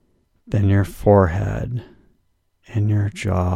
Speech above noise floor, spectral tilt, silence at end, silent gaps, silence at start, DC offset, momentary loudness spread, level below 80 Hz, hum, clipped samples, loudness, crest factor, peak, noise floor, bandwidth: 47 dB; -8.5 dB/octave; 0 s; none; 0.5 s; under 0.1%; 13 LU; -38 dBFS; none; under 0.1%; -20 LUFS; 18 dB; -2 dBFS; -65 dBFS; 12.5 kHz